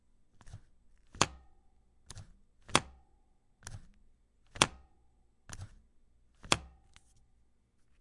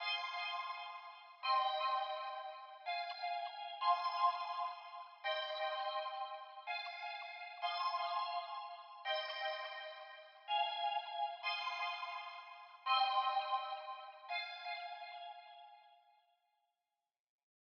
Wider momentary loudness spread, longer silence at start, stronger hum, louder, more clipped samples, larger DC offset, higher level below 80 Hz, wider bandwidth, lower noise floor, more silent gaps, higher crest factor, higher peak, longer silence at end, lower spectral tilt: first, 26 LU vs 15 LU; first, 0.45 s vs 0 s; neither; first, -32 LUFS vs -41 LUFS; neither; neither; first, -58 dBFS vs under -90 dBFS; first, 11.5 kHz vs 6.8 kHz; second, -68 dBFS vs under -90 dBFS; neither; first, 40 dB vs 20 dB; first, -2 dBFS vs -22 dBFS; second, 1.35 s vs 1.8 s; first, -2 dB/octave vs 11.5 dB/octave